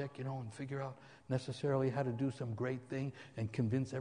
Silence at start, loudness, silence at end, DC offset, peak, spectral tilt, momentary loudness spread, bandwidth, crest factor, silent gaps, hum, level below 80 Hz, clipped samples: 0 s; -39 LUFS; 0 s; under 0.1%; -22 dBFS; -7.5 dB/octave; 9 LU; 10 kHz; 18 dB; none; none; -68 dBFS; under 0.1%